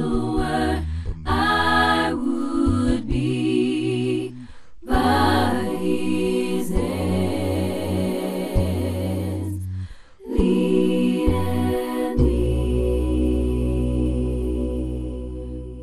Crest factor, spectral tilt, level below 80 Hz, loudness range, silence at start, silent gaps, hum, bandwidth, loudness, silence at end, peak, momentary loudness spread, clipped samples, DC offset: 16 dB; -6.5 dB/octave; -30 dBFS; 3 LU; 0 s; none; none; 13.5 kHz; -22 LUFS; 0 s; -4 dBFS; 10 LU; under 0.1%; under 0.1%